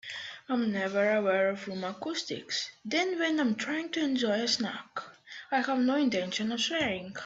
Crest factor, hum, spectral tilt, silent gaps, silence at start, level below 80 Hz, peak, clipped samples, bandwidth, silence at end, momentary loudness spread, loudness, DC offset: 16 dB; none; -3.5 dB/octave; none; 0.05 s; -74 dBFS; -14 dBFS; under 0.1%; 8.2 kHz; 0 s; 10 LU; -30 LUFS; under 0.1%